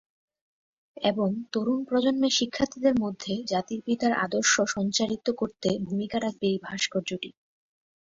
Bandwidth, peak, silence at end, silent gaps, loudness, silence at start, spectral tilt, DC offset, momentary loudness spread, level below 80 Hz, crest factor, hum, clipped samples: 7.8 kHz; -10 dBFS; 0.7 s; none; -27 LUFS; 0.95 s; -3.5 dB/octave; under 0.1%; 7 LU; -62 dBFS; 18 dB; none; under 0.1%